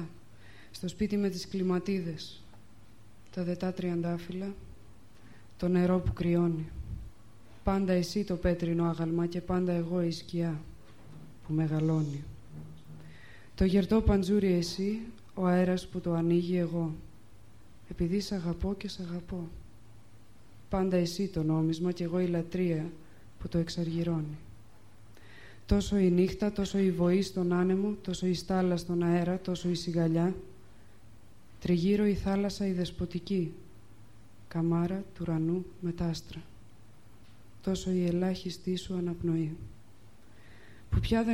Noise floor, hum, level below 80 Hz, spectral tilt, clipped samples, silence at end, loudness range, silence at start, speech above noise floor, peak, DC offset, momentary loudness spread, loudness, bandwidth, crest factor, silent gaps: -57 dBFS; none; -46 dBFS; -7 dB/octave; under 0.1%; 0 s; 6 LU; 0 s; 28 dB; -12 dBFS; 0.3%; 16 LU; -31 LUFS; 13.5 kHz; 20 dB; none